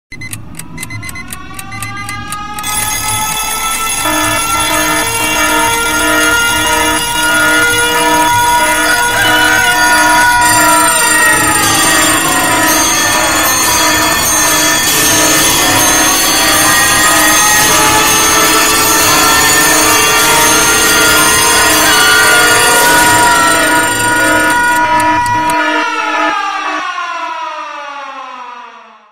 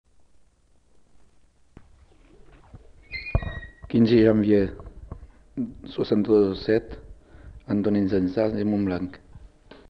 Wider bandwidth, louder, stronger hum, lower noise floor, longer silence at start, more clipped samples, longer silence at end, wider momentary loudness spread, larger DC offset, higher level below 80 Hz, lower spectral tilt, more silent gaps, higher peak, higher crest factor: first, over 20 kHz vs 6 kHz; first, -8 LUFS vs -23 LUFS; neither; second, -34 dBFS vs -59 dBFS; second, 0.1 s vs 2.75 s; neither; second, 0 s vs 0.45 s; second, 15 LU vs 25 LU; first, 2% vs under 0.1%; first, -34 dBFS vs -44 dBFS; second, -1 dB/octave vs -9 dB/octave; neither; first, 0 dBFS vs -6 dBFS; second, 10 dB vs 20 dB